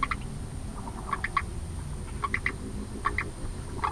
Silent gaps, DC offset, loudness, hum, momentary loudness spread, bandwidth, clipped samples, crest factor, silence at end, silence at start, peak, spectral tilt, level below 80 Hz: none; under 0.1%; -34 LUFS; none; 8 LU; 11 kHz; under 0.1%; 20 dB; 0 s; 0 s; -12 dBFS; -5 dB/octave; -38 dBFS